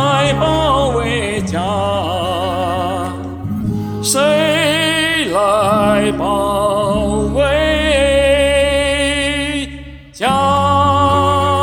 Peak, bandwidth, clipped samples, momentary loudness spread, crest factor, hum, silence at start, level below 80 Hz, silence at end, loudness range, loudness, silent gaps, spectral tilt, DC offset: -2 dBFS; 18.5 kHz; under 0.1%; 8 LU; 14 dB; none; 0 s; -30 dBFS; 0 s; 4 LU; -14 LUFS; none; -4.5 dB/octave; under 0.1%